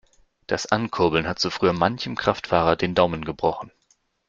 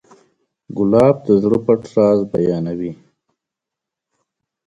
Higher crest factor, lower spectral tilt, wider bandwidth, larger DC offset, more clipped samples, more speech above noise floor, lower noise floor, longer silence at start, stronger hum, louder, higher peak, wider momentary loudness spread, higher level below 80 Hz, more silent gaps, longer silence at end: about the same, 22 dB vs 18 dB; second, -5 dB/octave vs -9 dB/octave; second, 7.8 kHz vs 10.5 kHz; neither; neither; second, 43 dB vs 69 dB; second, -66 dBFS vs -84 dBFS; second, 0.5 s vs 0.7 s; neither; second, -23 LUFS vs -16 LUFS; about the same, -2 dBFS vs 0 dBFS; second, 7 LU vs 12 LU; about the same, -50 dBFS vs -52 dBFS; neither; second, 0.6 s vs 1.7 s